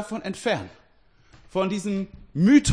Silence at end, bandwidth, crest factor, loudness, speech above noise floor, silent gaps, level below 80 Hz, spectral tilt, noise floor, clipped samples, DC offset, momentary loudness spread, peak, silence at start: 0 s; 10.5 kHz; 18 dB; -25 LUFS; 37 dB; none; -54 dBFS; -5.5 dB/octave; -60 dBFS; under 0.1%; under 0.1%; 14 LU; -6 dBFS; 0 s